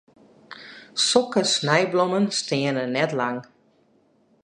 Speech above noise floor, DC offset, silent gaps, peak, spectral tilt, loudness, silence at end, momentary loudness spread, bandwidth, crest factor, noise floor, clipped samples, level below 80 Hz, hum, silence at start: 40 dB; under 0.1%; none; -2 dBFS; -3.5 dB/octave; -22 LUFS; 1.05 s; 15 LU; 11 kHz; 22 dB; -62 dBFS; under 0.1%; -72 dBFS; none; 0.5 s